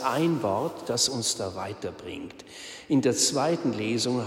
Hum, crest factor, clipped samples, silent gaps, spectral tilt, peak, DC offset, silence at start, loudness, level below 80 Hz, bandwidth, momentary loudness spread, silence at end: none; 18 dB; under 0.1%; none; -3.5 dB/octave; -10 dBFS; under 0.1%; 0 s; -26 LUFS; -64 dBFS; 16 kHz; 17 LU; 0 s